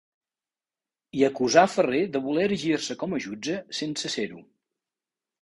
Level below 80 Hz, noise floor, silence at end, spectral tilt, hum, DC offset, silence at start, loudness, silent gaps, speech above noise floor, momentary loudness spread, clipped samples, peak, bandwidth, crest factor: -66 dBFS; under -90 dBFS; 1 s; -4 dB/octave; none; under 0.1%; 1.15 s; -25 LUFS; none; over 65 dB; 11 LU; under 0.1%; -4 dBFS; 11.5 kHz; 22 dB